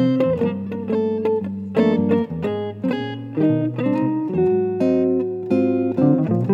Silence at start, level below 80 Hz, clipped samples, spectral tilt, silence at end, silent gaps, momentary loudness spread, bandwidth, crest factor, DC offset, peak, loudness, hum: 0 s; -56 dBFS; under 0.1%; -9.5 dB/octave; 0 s; none; 7 LU; 6 kHz; 14 dB; under 0.1%; -4 dBFS; -20 LUFS; none